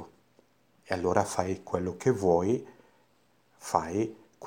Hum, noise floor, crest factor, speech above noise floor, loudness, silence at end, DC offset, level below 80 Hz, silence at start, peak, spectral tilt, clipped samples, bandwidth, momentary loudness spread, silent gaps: none; -68 dBFS; 22 dB; 39 dB; -29 LUFS; 0 s; under 0.1%; -62 dBFS; 0 s; -8 dBFS; -6 dB/octave; under 0.1%; 16.5 kHz; 8 LU; none